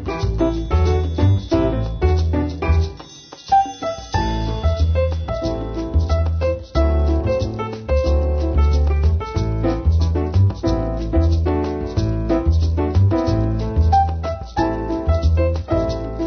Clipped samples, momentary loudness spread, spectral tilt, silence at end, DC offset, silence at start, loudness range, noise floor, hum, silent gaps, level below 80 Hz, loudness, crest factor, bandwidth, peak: under 0.1%; 6 LU; -8 dB/octave; 0 s; under 0.1%; 0 s; 2 LU; -39 dBFS; none; none; -22 dBFS; -19 LUFS; 14 dB; 6.6 kHz; -4 dBFS